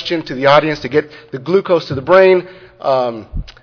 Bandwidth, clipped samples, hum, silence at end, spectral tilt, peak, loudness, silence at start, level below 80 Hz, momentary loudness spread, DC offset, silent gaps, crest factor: 5.4 kHz; 0.2%; none; 0.15 s; -6.5 dB/octave; 0 dBFS; -14 LUFS; 0 s; -36 dBFS; 17 LU; under 0.1%; none; 14 dB